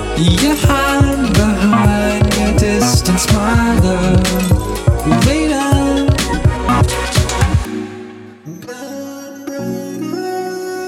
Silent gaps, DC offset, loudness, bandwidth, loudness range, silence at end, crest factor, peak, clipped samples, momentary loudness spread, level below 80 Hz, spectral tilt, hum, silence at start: none; under 0.1%; -14 LUFS; 17 kHz; 8 LU; 0 s; 14 dB; 0 dBFS; under 0.1%; 15 LU; -24 dBFS; -5.5 dB/octave; none; 0 s